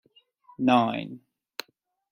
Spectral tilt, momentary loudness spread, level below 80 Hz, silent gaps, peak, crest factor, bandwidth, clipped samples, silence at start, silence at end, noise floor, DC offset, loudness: -6 dB/octave; 19 LU; -72 dBFS; none; -8 dBFS; 20 dB; 16.5 kHz; under 0.1%; 0.6 s; 0.95 s; -66 dBFS; under 0.1%; -25 LUFS